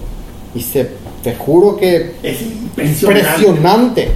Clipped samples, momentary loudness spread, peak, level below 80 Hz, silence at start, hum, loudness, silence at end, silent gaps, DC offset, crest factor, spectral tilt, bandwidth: under 0.1%; 14 LU; 0 dBFS; -30 dBFS; 0 s; none; -13 LUFS; 0 s; none; under 0.1%; 12 dB; -5.5 dB/octave; 16.5 kHz